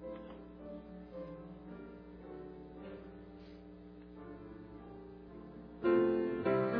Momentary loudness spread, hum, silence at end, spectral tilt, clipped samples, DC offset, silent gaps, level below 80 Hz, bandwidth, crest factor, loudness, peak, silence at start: 20 LU; 60 Hz at -55 dBFS; 0 s; -7 dB/octave; under 0.1%; under 0.1%; none; -62 dBFS; 5 kHz; 20 dB; -38 LUFS; -20 dBFS; 0 s